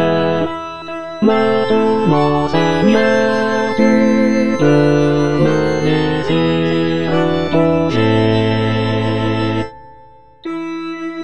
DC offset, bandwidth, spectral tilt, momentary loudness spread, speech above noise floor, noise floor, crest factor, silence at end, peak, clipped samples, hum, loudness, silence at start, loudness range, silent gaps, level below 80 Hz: 3%; 10 kHz; -7 dB/octave; 11 LU; 31 dB; -43 dBFS; 14 dB; 0 s; 0 dBFS; under 0.1%; none; -15 LUFS; 0 s; 3 LU; none; -42 dBFS